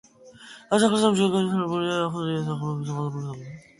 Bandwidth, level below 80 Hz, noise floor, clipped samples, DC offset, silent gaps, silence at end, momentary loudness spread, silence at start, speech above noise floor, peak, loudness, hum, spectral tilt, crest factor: 11.5 kHz; -64 dBFS; -48 dBFS; under 0.1%; under 0.1%; none; 0.2 s; 15 LU; 0.25 s; 24 dB; -6 dBFS; -24 LUFS; none; -5.5 dB/octave; 18 dB